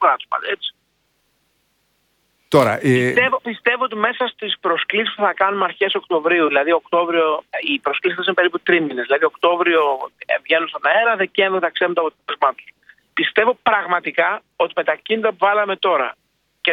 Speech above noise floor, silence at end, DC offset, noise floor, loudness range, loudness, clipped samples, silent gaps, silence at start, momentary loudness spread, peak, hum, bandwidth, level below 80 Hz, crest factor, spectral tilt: 48 dB; 0 s; under 0.1%; -66 dBFS; 2 LU; -18 LUFS; under 0.1%; none; 0 s; 6 LU; 0 dBFS; none; 16 kHz; -66 dBFS; 18 dB; -5.5 dB/octave